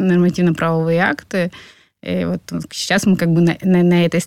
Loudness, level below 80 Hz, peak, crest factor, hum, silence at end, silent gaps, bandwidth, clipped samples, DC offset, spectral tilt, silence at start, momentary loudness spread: -17 LUFS; -50 dBFS; -2 dBFS; 14 dB; none; 0 s; none; 13.5 kHz; under 0.1%; under 0.1%; -6 dB/octave; 0 s; 10 LU